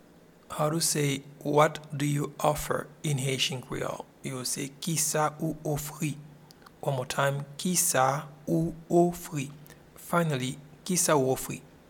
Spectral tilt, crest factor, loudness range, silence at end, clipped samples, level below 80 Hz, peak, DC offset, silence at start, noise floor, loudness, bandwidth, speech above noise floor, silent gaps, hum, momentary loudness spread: -4 dB/octave; 22 dB; 3 LU; 0.2 s; under 0.1%; -56 dBFS; -8 dBFS; under 0.1%; 0.5 s; -56 dBFS; -29 LUFS; 18.5 kHz; 27 dB; none; none; 12 LU